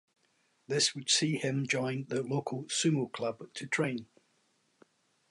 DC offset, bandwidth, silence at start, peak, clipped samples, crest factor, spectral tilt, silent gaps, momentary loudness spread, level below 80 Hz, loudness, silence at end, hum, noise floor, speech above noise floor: under 0.1%; 11.5 kHz; 0.7 s; -14 dBFS; under 0.1%; 20 dB; -3.5 dB/octave; none; 9 LU; -80 dBFS; -31 LUFS; 1.25 s; none; -73 dBFS; 41 dB